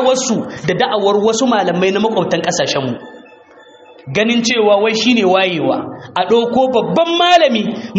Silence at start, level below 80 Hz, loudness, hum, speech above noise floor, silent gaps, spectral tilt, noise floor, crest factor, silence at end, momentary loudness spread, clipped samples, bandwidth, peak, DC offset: 0 s; -56 dBFS; -14 LUFS; none; 28 dB; none; -4 dB/octave; -42 dBFS; 14 dB; 0 s; 8 LU; under 0.1%; 8.2 kHz; 0 dBFS; under 0.1%